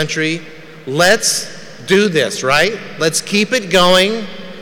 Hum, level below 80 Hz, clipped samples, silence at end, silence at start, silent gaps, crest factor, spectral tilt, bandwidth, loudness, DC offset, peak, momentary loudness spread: none; -46 dBFS; under 0.1%; 0 s; 0 s; none; 12 dB; -3 dB/octave; over 20 kHz; -14 LUFS; under 0.1%; -4 dBFS; 14 LU